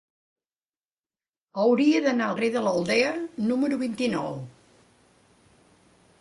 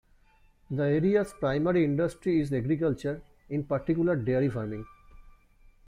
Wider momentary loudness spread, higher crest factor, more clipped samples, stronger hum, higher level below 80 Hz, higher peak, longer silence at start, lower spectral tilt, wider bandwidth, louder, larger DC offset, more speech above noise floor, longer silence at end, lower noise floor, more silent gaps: about the same, 13 LU vs 11 LU; about the same, 16 dB vs 16 dB; neither; neither; second, -68 dBFS vs -54 dBFS; first, -10 dBFS vs -14 dBFS; first, 1.55 s vs 0.7 s; second, -5.5 dB/octave vs -8.5 dB/octave; about the same, 11.5 kHz vs 12 kHz; first, -25 LUFS vs -28 LUFS; neither; first, over 66 dB vs 34 dB; first, 1.7 s vs 0.55 s; first, under -90 dBFS vs -61 dBFS; neither